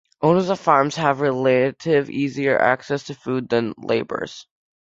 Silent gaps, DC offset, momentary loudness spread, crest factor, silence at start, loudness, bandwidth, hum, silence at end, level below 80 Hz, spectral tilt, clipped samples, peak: none; under 0.1%; 10 LU; 20 dB; 0.2 s; -20 LUFS; 7.8 kHz; none; 0.45 s; -60 dBFS; -6 dB/octave; under 0.1%; 0 dBFS